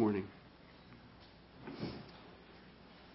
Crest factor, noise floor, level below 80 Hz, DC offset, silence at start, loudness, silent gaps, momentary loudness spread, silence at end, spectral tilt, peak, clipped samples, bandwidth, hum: 24 dB; -59 dBFS; -66 dBFS; under 0.1%; 0 s; -44 LUFS; none; 16 LU; 0 s; -6 dB/octave; -20 dBFS; under 0.1%; 5.6 kHz; none